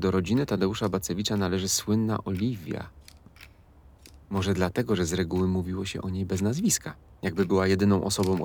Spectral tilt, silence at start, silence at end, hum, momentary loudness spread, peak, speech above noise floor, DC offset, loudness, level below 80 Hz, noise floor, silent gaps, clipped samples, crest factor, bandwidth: -5 dB/octave; 0 s; 0 s; none; 9 LU; -10 dBFS; 28 dB; under 0.1%; -27 LUFS; -50 dBFS; -54 dBFS; none; under 0.1%; 16 dB; over 20 kHz